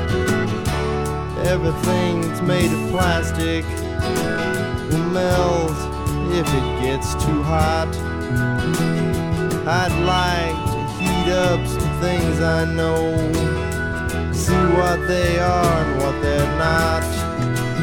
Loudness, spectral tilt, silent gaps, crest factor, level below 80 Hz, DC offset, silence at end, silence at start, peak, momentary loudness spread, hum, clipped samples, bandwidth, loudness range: -20 LUFS; -5.5 dB/octave; none; 16 dB; -30 dBFS; under 0.1%; 0 s; 0 s; -4 dBFS; 5 LU; none; under 0.1%; 18 kHz; 2 LU